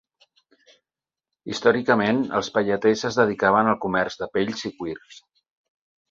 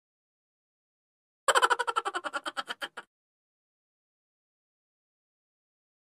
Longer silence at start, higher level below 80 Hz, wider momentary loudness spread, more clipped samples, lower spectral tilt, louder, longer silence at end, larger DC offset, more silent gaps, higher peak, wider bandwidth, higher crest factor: about the same, 1.45 s vs 1.5 s; first, -60 dBFS vs -86 dBFS; about the same, 14 LU vs 14 LU; neither; first, -5 dB/octave vs 1 dB/octave; first, -22 LUFS vs -29 LUFS; second, 0.95 s vs 3.05 s; neither; neither; first, -4 dBFS vs -8 dBFS; second, 7.8 kHz vs 15.5 kHz; second, 20 dB vs 28 dB